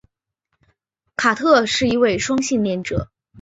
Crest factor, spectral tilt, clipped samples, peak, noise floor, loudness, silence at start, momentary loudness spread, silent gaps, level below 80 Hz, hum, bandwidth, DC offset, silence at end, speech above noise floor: 18 dB; -4 dB/octave; under 0.1%; -2 dBFS; -75 dBFS; -18 LUFS; 1.2 s; 11 LU; none; -46 dBFS; none; 8.2 kHz; under 0.1%; 0 s; 57 dB